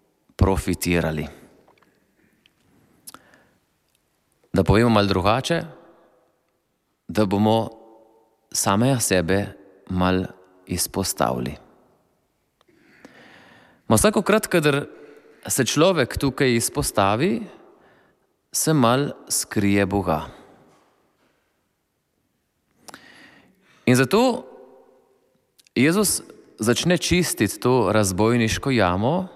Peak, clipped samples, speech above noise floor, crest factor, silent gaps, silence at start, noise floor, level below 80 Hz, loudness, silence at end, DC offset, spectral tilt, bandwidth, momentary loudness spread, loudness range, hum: -4 dBFS; under 0.1%; 52 dB; 20 dB; none; 0.4 s; -72 dBFS; -42 dBFS; -21 LUFS; 0.05 s; under 0.1%; -4.5 dB/octave; 16 kHz; 11 LU; 7 LU; none